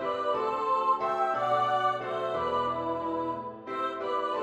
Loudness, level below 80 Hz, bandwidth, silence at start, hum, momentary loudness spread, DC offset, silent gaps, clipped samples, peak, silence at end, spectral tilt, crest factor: -29 LUFS; -64 dBFS; 10.5 kHz; 0 s; none; 7 LU; under 0.1%; none; under 0.1%; -14 dBFS; 0 s; -5.5 dB/octave; 14 dB